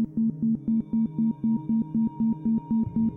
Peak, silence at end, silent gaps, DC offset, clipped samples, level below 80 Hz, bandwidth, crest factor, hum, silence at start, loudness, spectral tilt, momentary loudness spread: -16 dBFS; 0 s; none; under 0.1%; under 0.1%; -54 dBFS; 1.1 kHz; 8 dB; none; 0 s; -26 LUFS; -13 dB/octave; 2 LU